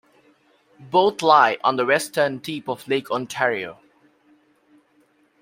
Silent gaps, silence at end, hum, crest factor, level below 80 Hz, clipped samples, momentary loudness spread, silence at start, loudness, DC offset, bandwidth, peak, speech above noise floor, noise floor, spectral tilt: none; 1.7 s; none; 22 dB; -72 dBFS; under 0.1%; 14 LU; 0.8 s; -20 LUFS; under 0.1%; 16 kHz; -2 dBFS; 41 dB; -61 dBFS; -4 dB/octave